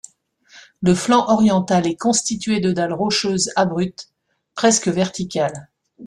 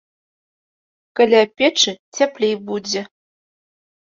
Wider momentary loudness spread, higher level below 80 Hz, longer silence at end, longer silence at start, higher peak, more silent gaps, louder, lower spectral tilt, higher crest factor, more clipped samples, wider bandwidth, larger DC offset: about the same, 9 LU vs 11 LU; first, -54 dBFS vs -70 dBFS; second, 0 s vs 1 s; second, 0.55 s vs 1.15 s; about the same, -2 dBFS vs -2 dBFS; second, none vs 1.99-2.12 s; about the same, -18 LUFS vs -17 LUFS; first, -4.5 dB/octave vs -2.5 dB/octave; about the same, 16 dB vs 18 dB; neither; first, 12 kHz vs 7.8 kHz; neither